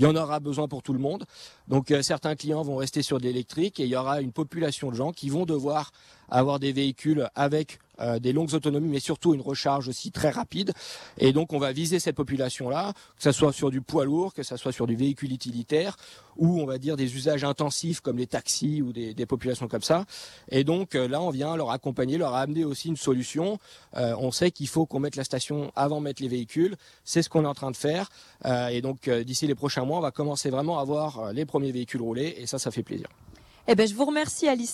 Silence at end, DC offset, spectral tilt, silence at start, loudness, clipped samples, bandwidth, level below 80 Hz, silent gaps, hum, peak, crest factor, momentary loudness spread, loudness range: 0 s; under 0.1%; -5.5 dB/octave; 0 s; -27 LUFS; under 0.1%; 14 kHz; -62 dBFS; none; none; -8 dBFS; 20 dB; 7 LU; 2 LU